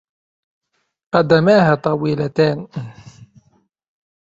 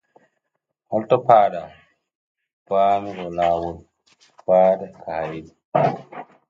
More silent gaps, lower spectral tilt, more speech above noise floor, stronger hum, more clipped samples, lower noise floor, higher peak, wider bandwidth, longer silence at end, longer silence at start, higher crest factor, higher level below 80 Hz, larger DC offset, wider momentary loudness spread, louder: second, none vs 2.15-2.35 s, 2.53-2.66 s, 5.65-5.72 s; about the same, -7.5 dB/octave vs -7.5 dB/octave; second, 45 dB vs 58 dB; neither; neither; second, -60 dBFS vs -78 dBFS; about the same, -2 dBFS vs -2 dBFS; about the same, 7.8 kHz vs 7.4 kHz; first, 1 s vs 0.25 s; first, 1.15 s vs 0.9 s; about the same, 18 dB vs 20 dB; about the same, -56 dBFS vs -56 dBFS; neither; about the same, 18 LU vs 18 LU; first, -16 LUFS vs -20 LUFS